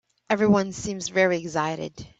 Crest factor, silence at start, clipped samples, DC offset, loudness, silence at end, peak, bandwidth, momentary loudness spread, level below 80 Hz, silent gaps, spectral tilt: 18 dB; 0.3 s; under 0.1%; under 0.1%; -24 LUFS; 0.1 s; -8 dBFS; 8.2 kHz; 10 LU; -56 dBFS; none; -5 dB/octave